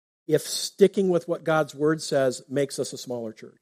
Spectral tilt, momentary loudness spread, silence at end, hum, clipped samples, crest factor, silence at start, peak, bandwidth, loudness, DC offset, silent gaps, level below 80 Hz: -4.5 dB/octave; 11 LU; 0.15 s; none; under 0.1%; 20 dB; 0.3 s; -4 dBFS; 15.5 kHz; -25 LUFS; under 0.1%; none; -72 dBFS